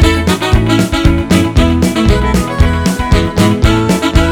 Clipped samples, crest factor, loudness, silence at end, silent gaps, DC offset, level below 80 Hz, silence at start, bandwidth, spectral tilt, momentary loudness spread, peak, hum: 0.7%; 10 dB; -11 LUFS; 0 s; none; 0.7%; -16 dBFS; 0 s; 19.5 kHz; -6 dB/octave; 2 LU; 0 dBFS; none